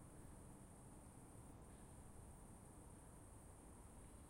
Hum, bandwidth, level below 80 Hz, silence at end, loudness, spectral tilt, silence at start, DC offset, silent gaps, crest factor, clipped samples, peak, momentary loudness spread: none; 16 kHz; -66 dBFS; 0 s; -62 LUFS; -5.5 dB/octave; 0 s; under 0.1%; none; 12 dB; under 0.1%; -48 dBFS; 1 LU